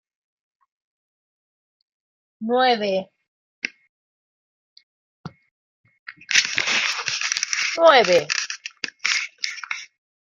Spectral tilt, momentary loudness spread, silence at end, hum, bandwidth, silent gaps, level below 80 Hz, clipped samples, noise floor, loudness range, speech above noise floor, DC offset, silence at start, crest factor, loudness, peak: -1 dB/octave; 16 LU; 0.55 s; none; 14 kHz; 3.28-3.62 s, 3.89-4.76 s, 4.83-5.24 s, 5.51-5.84 s, 5.99-6.06 s; -74 dBFS; under 0.1%; under -90 dBFS; 8 LU; over 73 dB; under 0.1%; 2.4 s; 24 dB; -20 LUFS; 0 dBFS